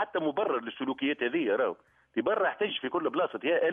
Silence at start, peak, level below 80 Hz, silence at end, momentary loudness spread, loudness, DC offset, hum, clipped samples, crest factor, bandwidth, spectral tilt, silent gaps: 0 s; -14 dBFS; -76 dBFS; 0 s; 5 LU; -30 LUFS; under 0.1%; none; under 0.1%; 16 dB; 3.8 kHz; -7.5 dB/octave; none